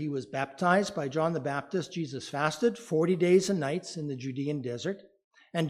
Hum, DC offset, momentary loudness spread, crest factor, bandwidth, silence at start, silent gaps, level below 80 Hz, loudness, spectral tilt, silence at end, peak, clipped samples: none; under 0.1%; 11 LU; 20 dB; 14.5 kHz; 0 s; 5.24-5.31 s; -74 dBFS; -30 LUFS; -5.5 dB/octave; 0 s; -10 dBFS; under 0.1%